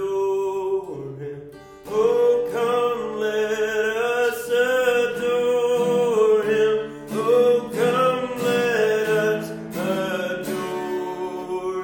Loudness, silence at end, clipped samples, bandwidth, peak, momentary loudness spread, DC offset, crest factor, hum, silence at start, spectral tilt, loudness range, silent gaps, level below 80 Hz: -22 LUFS; 0 s; under 0.1%; 17.5 kHz; -8 dBFS; 10 LU; under 0.1%; 14 dB; none; 0 s; -4.5 dB/octave; 3 LU; none; -60 dBFS